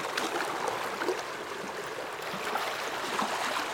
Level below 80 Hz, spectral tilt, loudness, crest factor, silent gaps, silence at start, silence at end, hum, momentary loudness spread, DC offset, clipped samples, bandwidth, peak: -70 dBFS; -2 dB/octave; -33 LUFS; 20 dB; none; 0 s; 0 s; none; 6 LU; under 0.1%; under 0.1%; 18 kHz; -14 dBFS